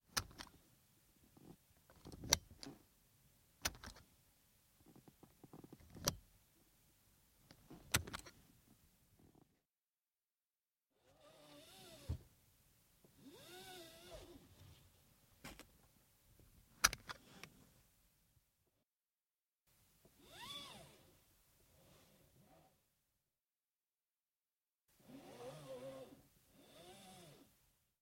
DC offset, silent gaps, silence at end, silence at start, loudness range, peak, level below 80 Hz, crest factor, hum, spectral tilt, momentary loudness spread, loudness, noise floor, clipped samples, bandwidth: under 0.1%; 18.92-18.96 s; 0.55 s; 0.1 s; 16 LU; -12 dBFS; -66 dBFS; 42 dB; none; -1.5 dB/octave; 28 LU; -44 LUFS; under -90 dBFS; under 0.1%; 16.5 kHz